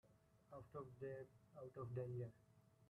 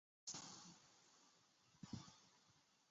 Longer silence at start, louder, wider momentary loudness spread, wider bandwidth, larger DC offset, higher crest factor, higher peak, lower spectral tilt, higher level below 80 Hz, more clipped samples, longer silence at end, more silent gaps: second, 0.05 s vs 0.25 s; first, -54 LUFS vs -57 LUFS; about the same, 13 LU vs 15 LU; first, 12 kHz vs 8 kHz; neither; about the same, 18 dB vs 22 dB; about the same, -36 dBFS vs -38 dBFS; first, -9.5 dB/octave vs -3.5 dB/octave; about the same, -80 dBFS vs -84 dBFS; neither; about the same, 0 s vs 0 s; neither